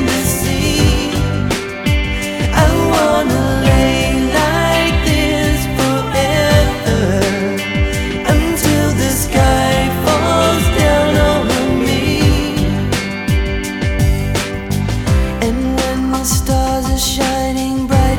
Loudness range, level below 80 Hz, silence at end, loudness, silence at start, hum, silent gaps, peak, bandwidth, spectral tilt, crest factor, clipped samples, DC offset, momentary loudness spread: 3 LU; -22 dBFS; 0 s; -14 LUFS; 0 s; none; none; 0 dBFS; 19.5 kHz; -5 dB/octave; 14 dB; under 0.1%; under 0.1%; 5 LU